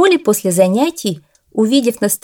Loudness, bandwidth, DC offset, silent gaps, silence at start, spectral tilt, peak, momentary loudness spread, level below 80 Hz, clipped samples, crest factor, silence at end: -15 LUFS; 19 kHz; under 0.1%; none; 0 s; -4.5 dB/octave; 0 dBFS; 11 LU; -64 dBFS; under 0.1%; 14 dB; 0.05 s